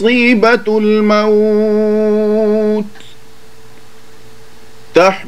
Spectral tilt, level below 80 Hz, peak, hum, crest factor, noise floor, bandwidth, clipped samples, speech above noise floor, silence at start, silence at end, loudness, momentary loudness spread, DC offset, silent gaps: -6 dB/octave; -56 dBFS; 0 dBFS; 60 Hz at -50 dBFS; 14 dB; -42 dBFS; 11.5 kHz; under 0.1%; 32 dB; 0 s; 0 s; -11 LUFS; 6 LU; 4%; none